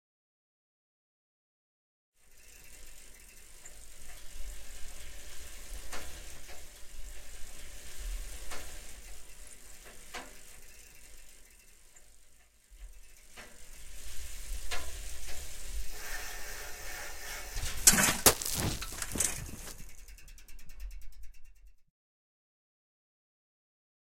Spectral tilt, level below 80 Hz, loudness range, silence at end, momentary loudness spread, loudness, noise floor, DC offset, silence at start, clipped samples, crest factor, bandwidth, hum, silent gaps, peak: -1.5 dB/octave; -46 dBFS; 25 LU; 2.25 s; 22 LU; -32 LUFS; -58 dBFS; under 0.1%; 2.25 s; under 0.1%; 34 dB; 16.5 kHz; none; none; -2 dBFS